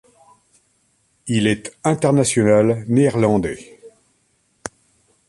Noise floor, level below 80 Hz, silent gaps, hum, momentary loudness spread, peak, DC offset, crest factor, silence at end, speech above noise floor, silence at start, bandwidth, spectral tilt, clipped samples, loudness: -64 dBFS; -50 dBFS; none; none; 20 LU; -2 dBFS; under 0.1%; 18 dB; 0.6 s; 47 dB; 1.25 s; 11.5 kHz; -5.5 dB/octave; under 0.1%; -17 LUFS